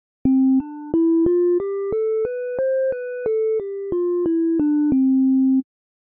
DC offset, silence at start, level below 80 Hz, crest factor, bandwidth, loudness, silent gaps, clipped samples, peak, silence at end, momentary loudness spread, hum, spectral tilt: under 0.1%; 0.25 s; -52 dBFS; 14 dB; 2.6 kHz; -20 LUFS; none; under 0.1%; -6 dBFS; 0.55 s; 7 LU; none; -10.5 dB/octave